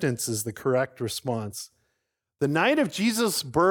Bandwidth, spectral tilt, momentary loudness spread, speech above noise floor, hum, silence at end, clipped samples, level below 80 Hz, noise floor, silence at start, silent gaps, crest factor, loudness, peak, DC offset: 19.5 kHz; -4.5 dB/octave; 10 LU; 54 dB; none; 0 s; under 0.1%; -64 dBFS; -80 dBFS; 0 s; none; 18 dB; -26 LUFS; -8 dBFS; under 0.1%